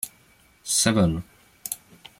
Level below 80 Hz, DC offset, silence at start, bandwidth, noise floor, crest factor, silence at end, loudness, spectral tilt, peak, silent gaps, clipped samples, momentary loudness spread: -50 dBFS; under 0.1%; 0.05 s; 16.5 kHz; -58 dBFS; 20 dB; 0.45 s; -24 LUFS; -3.5 dB/octave; -6 dBFS; none; under 0.1%; 17 LU